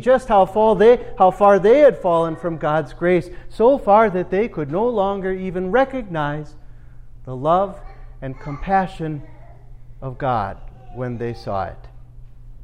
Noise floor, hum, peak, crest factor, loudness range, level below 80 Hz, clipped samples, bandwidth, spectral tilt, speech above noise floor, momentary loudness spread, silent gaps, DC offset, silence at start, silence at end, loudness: -39 dBFS; none; -2 dBFS; 16 dB; 10 LU; -40 dBFS; under 0.1%; 10.5 kHz; -7.5 dB/octave; 21 dB; 18 LU; none; under 0.1%; 0 s; 0 s; -18 LUFS